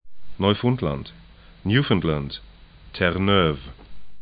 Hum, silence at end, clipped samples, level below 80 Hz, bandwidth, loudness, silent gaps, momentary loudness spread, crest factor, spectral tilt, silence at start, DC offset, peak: none; 0 s; under 0.1%; -42 dBFS; 5 kHz; -23 LUFS; none; 18 LU; 20 dB; -11 dB/octave; 0.05 s; under 0.1%; -4 dBFS